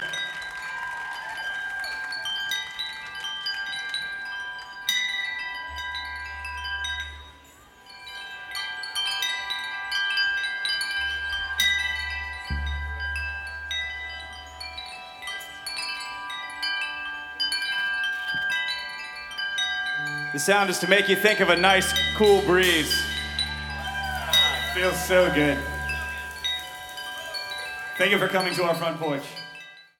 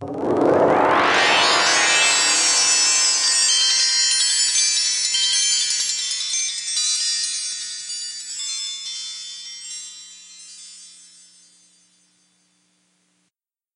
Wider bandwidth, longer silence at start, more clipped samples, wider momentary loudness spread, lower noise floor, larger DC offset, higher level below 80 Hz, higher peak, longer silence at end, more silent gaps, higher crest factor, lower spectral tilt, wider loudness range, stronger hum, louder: first, 18 kHz vs 12.5 kHz; about the same, 0 s vs 0 s; neither; second, 14 LU vs 17 LU; second, -51 dBFS vs -77 dBFS; neither; first, -44 dBFS vs -70 dBFS; about the same, -4 dBFS vs -4 dBFS; second, 0.15 s vs 2.85 s; neither; first, 24 dB vs 16 dB; first, -2.5 dB/octave vs 0 dB/octave; second, 11 LU vs 18 LU; neither; second, -25 LUFS vs -17 LUFS